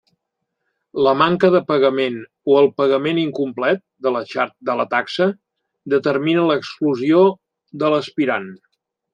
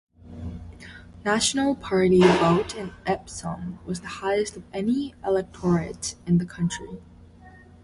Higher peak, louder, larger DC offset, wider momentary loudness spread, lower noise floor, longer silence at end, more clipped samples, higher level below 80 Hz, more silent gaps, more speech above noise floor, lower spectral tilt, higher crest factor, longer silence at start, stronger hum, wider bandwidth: first, -2 dBFS vs -6 dBFS; first, -18 LUFS vs -24 LUFS; neither; second, 8 LU vs 21 LU; first, -77 dBFS vs -49 dBFS; first, 0.6 s vs 0.3 s; neither; second, -64 dBFS vs -48 dBFS; neither; first, 60 dB vs 25 dB; first, -7 dB/octave vs -5 dB/octave; about the same, 18 dB vs 20 dB; first, 0.95 s vs 0.25 s; neither; second, 8.6 kHz vs 11.5 kHz